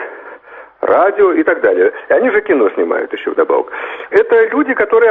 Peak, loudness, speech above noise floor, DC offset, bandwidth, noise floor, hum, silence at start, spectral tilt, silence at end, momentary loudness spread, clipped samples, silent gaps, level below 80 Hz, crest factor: 0 dBFS; -13 LUFS; 24 dB; under 0.1%; 4 kHz; -36 dBFS; none; 0 s; -7 dB/octave; 0 s; 11 LU; under 0.1%; none; -56 dBFS; 12 dB